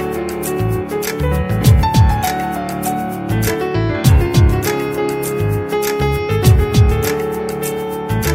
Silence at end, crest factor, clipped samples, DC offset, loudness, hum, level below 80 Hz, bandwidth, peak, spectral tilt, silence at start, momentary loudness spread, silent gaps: 0 s; 14 dB; under 0.1%; under 0.1%; -16 LUFS; none; -22 dBFS; 16.5 kHz; 0 dBFS; -6 dB/octave; 0 s; 8 LU; none